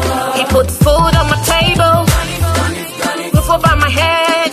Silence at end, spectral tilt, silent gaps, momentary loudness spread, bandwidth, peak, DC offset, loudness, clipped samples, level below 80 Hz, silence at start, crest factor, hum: 0 s; -4.5 dB/octave; none; 6 LU; 15 kHz; 0 dBFS; under 0.1%; -12 LUFS; under 0.1%; -22 dBFS; 0 s; 12 dB; none